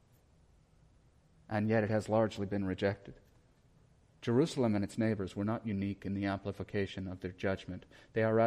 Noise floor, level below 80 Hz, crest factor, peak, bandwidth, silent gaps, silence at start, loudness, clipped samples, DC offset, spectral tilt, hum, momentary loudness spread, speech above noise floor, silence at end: -66 dBFS; -64 dBFS; 18 dB; -18 dBFS; 11 kHz; none; 1.5 s; -35 LUFS; under 0.1%; under 0.1%; -7 dB/octave; none; 10 LU; 32 dB; 0 s